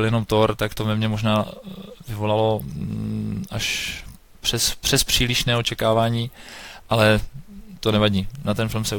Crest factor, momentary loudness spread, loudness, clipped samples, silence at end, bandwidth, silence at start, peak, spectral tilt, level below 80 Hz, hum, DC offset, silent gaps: 18 dB; 16 LU; -22 LUFS; under 0.1%; 0 s; 18 kHz; 0 s; -4 dBFS; -4.5 dB/octave; -38 dBFS; none; under 0.1%; none